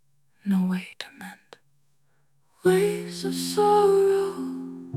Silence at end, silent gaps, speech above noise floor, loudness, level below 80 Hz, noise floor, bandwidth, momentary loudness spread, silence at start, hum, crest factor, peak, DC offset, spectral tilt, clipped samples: 0 s; none; 48 dB; -24 LUFS; -70 dBFS; -70 dBFS; 15 kHz; 19 LU; 0.45 s; none; 18 dB; -8 dBFS; under 0.1%; -5.5 dB/octave; under 0.1%